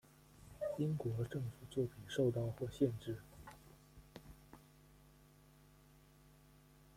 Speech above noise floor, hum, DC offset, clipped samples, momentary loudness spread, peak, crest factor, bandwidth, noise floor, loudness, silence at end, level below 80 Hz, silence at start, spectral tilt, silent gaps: 26 dB; none; under 0.1%; under 0.1%; 24 LU; -22 dBFS; 22 dB; 16.5 kHz; -65 dBFS; -41 LUFS; 2.35 s; -66 dBFS; 0.35 s; -7.5 dB/octave; none